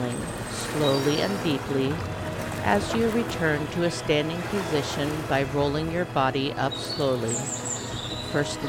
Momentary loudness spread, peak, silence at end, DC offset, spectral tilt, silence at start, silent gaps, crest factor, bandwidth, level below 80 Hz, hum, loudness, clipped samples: 7 LU; -8 dBFS; 0 s; under 0.1%; -4.5 dB/octave; 0 s; none; 18 dB; 18 kHz; -46 dBFS; none; -26 LUFS; under 0.1%